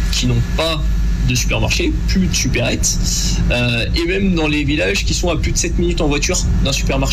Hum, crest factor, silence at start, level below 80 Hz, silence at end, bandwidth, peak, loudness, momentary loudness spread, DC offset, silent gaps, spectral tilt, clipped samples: none; 10 dB; 0 s; -20 dBFS; 0 s; 15 kHz; -6 dBFS; -16 LUFS; 2 LU; under 0.1%; none; -4 dB/octave; under 0.1%